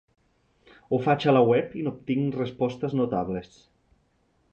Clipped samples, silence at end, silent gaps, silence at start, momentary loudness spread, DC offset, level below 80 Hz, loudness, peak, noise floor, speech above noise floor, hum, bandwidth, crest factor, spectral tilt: under 0.1%; 1.05 s; none; 0.9 s; 12 LU; under 0.1%; -60 dBFS; -25 LUFS; -8 dBFS; -68 dBFS; 43 dB; none; 7.6 kHz; 20 dB; -8.5 dB/octave